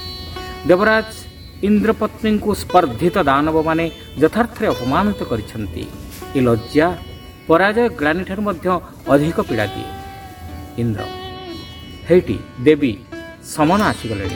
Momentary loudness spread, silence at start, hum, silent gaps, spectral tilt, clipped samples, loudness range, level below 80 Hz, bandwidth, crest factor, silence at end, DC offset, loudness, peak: 17 LU; 0 s; none; none; -6.5 dB/octave; under 0.1%; 5 LU; -40 dBFS; 19.5 kHz; 18 dB; 0 s; under 0.1%; -18 LUFS; 0 dBFS